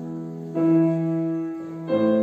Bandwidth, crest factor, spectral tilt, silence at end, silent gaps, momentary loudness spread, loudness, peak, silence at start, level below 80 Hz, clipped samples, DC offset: 4.6 kHz; 12 dB; -10 dB/octave; 0 s; none; 13 LU; -24 LUFS; -10 dBFS; 0 s; -70 dBFS; under 0.1%; under 0.1%